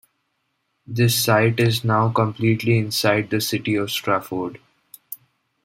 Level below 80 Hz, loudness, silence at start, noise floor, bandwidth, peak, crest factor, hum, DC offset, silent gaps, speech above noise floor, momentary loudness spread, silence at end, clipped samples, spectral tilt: -58 dBFS; -20 LUFS; 0.9 s; -72 dBFS; 16.5 kHz; -4 dBFS; 18 dB; none; under 0.1%; none; 53 dB; 15 LU; 0.5 s; under 0.1%; -5 dB/octave